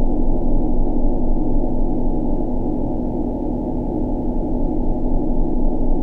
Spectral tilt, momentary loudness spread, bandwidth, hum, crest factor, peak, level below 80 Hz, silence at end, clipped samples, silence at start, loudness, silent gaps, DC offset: -12 dB/octave; 1 LU; 1 kHz; none; 10 dB; -6 dBFS; -18 dBFS; 0 s; under 0.1%; 0 s; -23 LUFS; none; under 0.1%